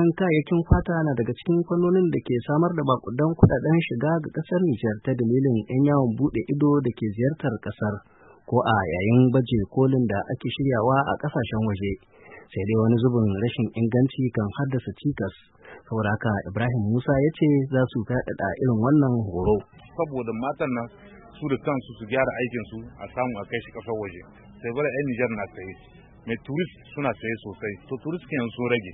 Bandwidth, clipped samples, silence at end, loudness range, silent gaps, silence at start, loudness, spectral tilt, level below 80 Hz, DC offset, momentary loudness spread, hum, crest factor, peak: 4 kHz; under 0.1%; 0 s; 7 LU; none; 0 s; -24 LUFS; -12.5 dB/octave; -44 dBFS; under 0.1%; 12 LU; none; 20 dB; -4 dBFS